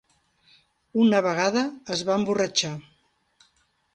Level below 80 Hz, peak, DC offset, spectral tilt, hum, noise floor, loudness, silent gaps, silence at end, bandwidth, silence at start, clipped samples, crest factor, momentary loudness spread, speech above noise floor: -68 dBFS; -8 dBFS; under 0.1%; -4 dB/octave; none; -67 dBFS; -24 LUFS; none; 1.15 s; 9.4 kHz; 0.95 s; under 0.1%; 20 dB; 10 LU; 44 dB